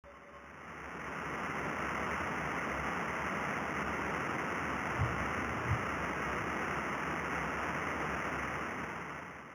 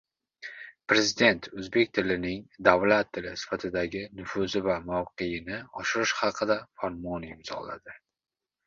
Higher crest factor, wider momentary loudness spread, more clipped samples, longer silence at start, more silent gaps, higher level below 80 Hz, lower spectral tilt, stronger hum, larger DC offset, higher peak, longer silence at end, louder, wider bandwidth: second, 18 dB vs 26 dB; second, 8 LU vs 15 LU; neither; second, 0.05 s vs 0.4 s; neither; about the same, -54 dBFS vs -56 dBFS; about the same, -5 dB/octave vs -4 dB/octave; neither; neither; second, -20 dBFS vs -2 dBFS; second, 0 s vs 0.7 s; second, -36 LUFS vs -28 LUFS; first, over 20 kHz vs 7.6 kHz